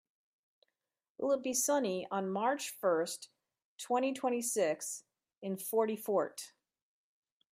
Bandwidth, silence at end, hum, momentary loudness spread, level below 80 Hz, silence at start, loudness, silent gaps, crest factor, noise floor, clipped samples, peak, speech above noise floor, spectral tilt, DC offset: 16 kHz; 1.05 s; none; 14 LU; -88 dBFS; 1.2 s; -34 LUFS; 3.64-3.77 s; 18 dB; -88 dBFS; under 0.1%; -18 dBFS; 54 dB; -3.5 dB/octave; under 0.1%